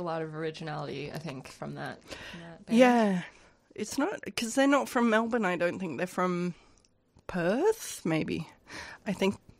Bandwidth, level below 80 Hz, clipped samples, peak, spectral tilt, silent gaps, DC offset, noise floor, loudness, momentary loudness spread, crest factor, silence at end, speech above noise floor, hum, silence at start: 16 kHz; -64 dBFS; under 0.1%; -8 dBFS; -5 dB/octave; none; under 0.1%; -64 dBFS; -30 LUFS; 18 LU; 22 dB; 0.25 s; 35 dB; none; 0 s